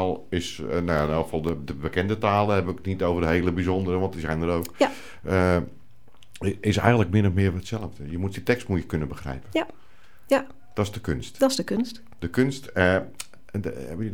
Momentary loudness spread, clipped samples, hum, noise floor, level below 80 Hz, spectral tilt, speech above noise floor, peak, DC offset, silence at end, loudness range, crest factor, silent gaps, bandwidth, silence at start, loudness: 11 LU; under 0.1%; none; -56 dBFS; -44 dBFS; -6.5 dB/octave; 32 dB; -4 dBFS; 0.9%; 0 s; 4 LU; 22 dB; none; 17.5 kHz; 0 s; -25 LUFS